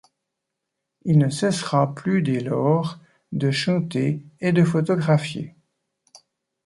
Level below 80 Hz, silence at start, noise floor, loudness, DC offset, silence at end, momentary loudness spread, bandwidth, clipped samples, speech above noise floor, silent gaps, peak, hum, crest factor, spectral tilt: -62 dBFS; 1.05 s; -81 dBFS; -22 LUFS; under 0.1%; 1.15 s; 12 LU; 11.5 kHz; under 0.1%; 61 dB; none; -6 dBFS; none; 18 dB; -6.5 dB/octave